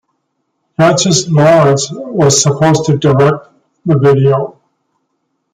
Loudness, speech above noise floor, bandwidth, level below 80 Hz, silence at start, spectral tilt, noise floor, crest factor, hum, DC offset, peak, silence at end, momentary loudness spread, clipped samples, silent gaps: -10 LUFS; 57 dB; 11.5 kHz; -48 dBFS; 0.8 s; -5 dB/octave; -67 dBFS; 12 dB; none; under 0.1%; 0 dBFS; 1.05 s; 10 LU; under 0.1%; none